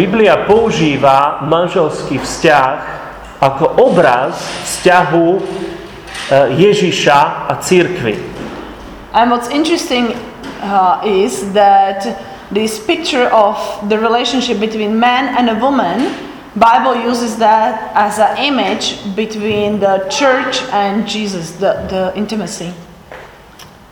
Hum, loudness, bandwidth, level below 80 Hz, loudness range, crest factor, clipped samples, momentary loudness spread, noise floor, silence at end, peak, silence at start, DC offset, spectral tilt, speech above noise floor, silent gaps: none; -13 LUFS; 20 kHz; -44 dBFS; 3 LU; 12 dB; 0.2%; 13 LU; -37 dBFS; 0.25 s; 0 dBFS; 0 s; under 0.1%; -4.5 dB/octave; 25 dB; none